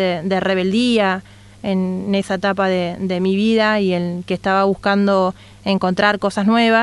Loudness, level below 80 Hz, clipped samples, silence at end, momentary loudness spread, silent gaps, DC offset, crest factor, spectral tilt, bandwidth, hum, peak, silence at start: -18 LUFS; -52 dBFS; under 0.1%; 0 s; 7 LU; none; under 0.1%; 16 dB; -6 dB/octave; 11.5 kHz; none; 0 dBFS; 0 s